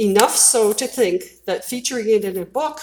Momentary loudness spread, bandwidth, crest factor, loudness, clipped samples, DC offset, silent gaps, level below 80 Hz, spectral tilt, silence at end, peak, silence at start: 13 LU; over 20 kHz; 18 dB; -18 LUFS; under 0.1%; under 0.1%; none; -60 dBFS; -2 dB/octave; 0 s; 0 dBFS; 0 s